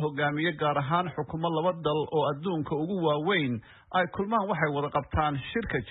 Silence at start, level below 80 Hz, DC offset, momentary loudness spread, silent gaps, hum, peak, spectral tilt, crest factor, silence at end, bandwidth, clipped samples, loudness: 0 s; -50 dBFS; under 0.1%; 5 LU; none; none; -12 dBFS; -10.5 dB/octave; 16 dB; 0 s; 4.1 kHz; under 0.1%; -29 LUFS